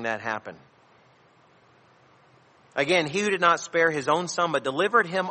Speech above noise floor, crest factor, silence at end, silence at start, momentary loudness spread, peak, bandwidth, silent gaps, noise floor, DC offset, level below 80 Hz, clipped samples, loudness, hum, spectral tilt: 34 dB; 20 dB; 0 s; 0 s; 10 LU; -6 dBFS; 8.8 kHz; none; -58 dBFS; under 0.1%; -72 dBFS; under 0.1%; -24 LUFS; none; -3.5 dB/octave